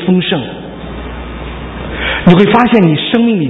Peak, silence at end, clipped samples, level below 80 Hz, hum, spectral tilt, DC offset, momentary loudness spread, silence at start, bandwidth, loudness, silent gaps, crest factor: 0 dBFS; 0 s; 0.4%; -30 dBFS; none; -8.5 dB/octave; under 0.1%; 17 LU; 0 s; 4.6 kHz; -10 LUFS; none; 12 dB